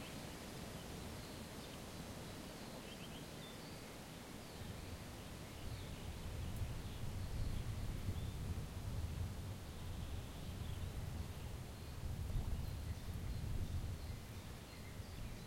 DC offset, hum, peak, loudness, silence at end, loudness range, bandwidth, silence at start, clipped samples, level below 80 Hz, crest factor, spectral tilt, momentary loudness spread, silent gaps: under 0.1%; none; -30 dBFS; -48 LUFS; 0 s; 5 LU; 16.5 kHz; 0 s; under 0.1%; -50 dBFS; 16 dB; -5.5 dB/octave; 6 LU; none